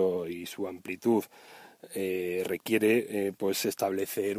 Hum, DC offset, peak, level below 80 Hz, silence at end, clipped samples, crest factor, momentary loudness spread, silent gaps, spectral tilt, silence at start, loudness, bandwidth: none; under 0.1%; -14 dBFS; -74 dBFS; 0 s; under 0.1%; 16 dB; 12 LU; none; -4.5 dB/octave; 0 s; -30 LUFS; 16 kHz